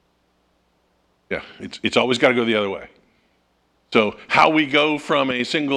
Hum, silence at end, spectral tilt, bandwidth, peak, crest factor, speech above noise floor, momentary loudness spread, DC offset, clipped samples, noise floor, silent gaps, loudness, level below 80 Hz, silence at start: none; 0 s; -4.5 dB/octave; 11.5 kHz; 0 dBFS; 22 dB; 45 dB; 14 LU; under 0.1%; under 0.1%; -64 dBFS; none; -19 LUFS; -60 dBFS; 1.3 s